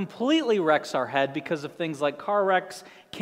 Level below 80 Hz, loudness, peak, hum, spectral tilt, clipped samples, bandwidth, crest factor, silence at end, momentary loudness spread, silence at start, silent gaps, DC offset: -76 dBFS; -25 LUFS; -8 dBFS; none; -5 dB/octave; under 0.1%; 15 kHz; 18 dB; 0 s; 11 LU; 0 s; none; under 0.1%